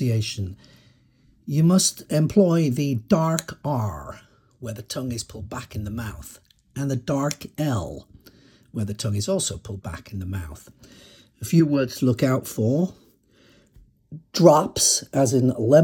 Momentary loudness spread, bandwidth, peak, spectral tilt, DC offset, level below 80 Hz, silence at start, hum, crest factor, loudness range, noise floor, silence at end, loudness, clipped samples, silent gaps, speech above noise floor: 18 LU; 18 kHz; 0 dBFS; -5.5 dB/octave; under 0.1%; -52 dBFS; 0 s; none; 22 dB; 8 LU; -59 dBFS; 0 s; -22 LUFS; under 0.1%; none; 36 dB